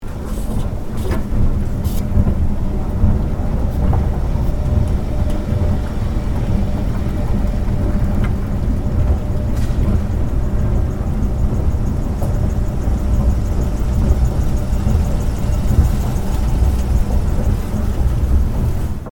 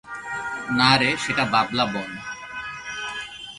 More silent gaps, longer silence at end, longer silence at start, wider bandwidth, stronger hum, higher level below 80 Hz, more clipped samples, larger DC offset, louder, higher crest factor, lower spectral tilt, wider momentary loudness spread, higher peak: neither; about the same, 0.05 s vs 0 s; about the same, 0 s vs 0.05 s; first, 17.5 kHz vs 11.5 kHz; neither; first, -18 dBFS vs -56 dBFS; neither; neither; first, -19 LUFS vs -23 LUFS; second, 14 dB vs 22 dB; first, -8 dB/octave vs -4 dB/octave; second, 4 LU vs 16 LU; first, 0 dBFS vs -4 dBFS